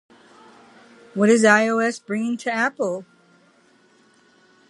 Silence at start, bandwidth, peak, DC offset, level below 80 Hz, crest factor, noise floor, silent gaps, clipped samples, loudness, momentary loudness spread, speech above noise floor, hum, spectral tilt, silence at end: 1.15 s; 11.5 kHz; -2 dBFS; under 0.1%; -76 dBFS; 22 dB; -57 dBFS; none; under 0.1%; -19 LUFS; 12 LU; 38 dB; none; -4.5 dB/octave; 1.65 s